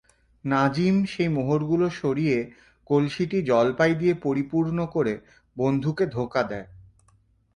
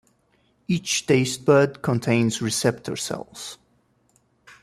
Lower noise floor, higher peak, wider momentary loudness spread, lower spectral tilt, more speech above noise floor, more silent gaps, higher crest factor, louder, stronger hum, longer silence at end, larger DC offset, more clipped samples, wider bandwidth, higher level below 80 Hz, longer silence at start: about the same, -62 dBFS vs -64 dBFS; about the same, -6 dBFS vs -4 dBFS; second, 7 LU vs 17 LU; first, -7.5 dB/octave vs -4.5 dB/octave; about the same, 39 dB vs 42 dB; neither; about the same, 18 dB vs 20 dB; about the same, -24 LUFS vs -22 LUFS; neither; second, 0.8 s vs 1.05 s; neither; neither; second, 10.5 kHz vs 14.5 kHz; about the same, -56 dBFS vs -60 dBFS; second, 0.45 s vs 0.7 s